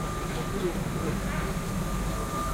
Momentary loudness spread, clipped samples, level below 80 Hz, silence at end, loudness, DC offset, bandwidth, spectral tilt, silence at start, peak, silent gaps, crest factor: 1 LU; under 0.1%; -36 dBFS; 0 s; -31 LUFS; under 0.1%; 16 kHz; -5.5 dB/octave; 0 s; -18 dBFS; none; 12 dB